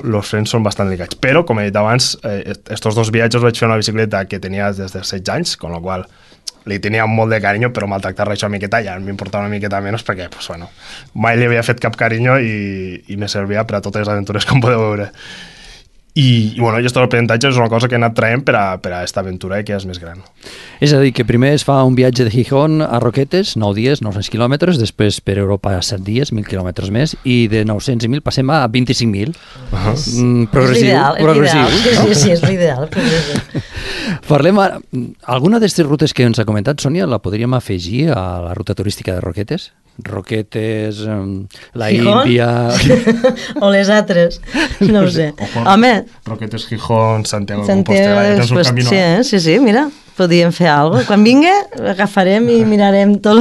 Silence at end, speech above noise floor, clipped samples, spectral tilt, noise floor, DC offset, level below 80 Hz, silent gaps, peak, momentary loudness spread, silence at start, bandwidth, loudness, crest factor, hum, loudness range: 0 s; 28 dB; under 0.1%; -5.5 dB/octave; -41 dBFS; under 0.1%; -36 dBFS; none; 0 dBFS; 13 LU; 0.05 s; 12.5 kHz; -14 LUFS; 14 dB; none; 7 LU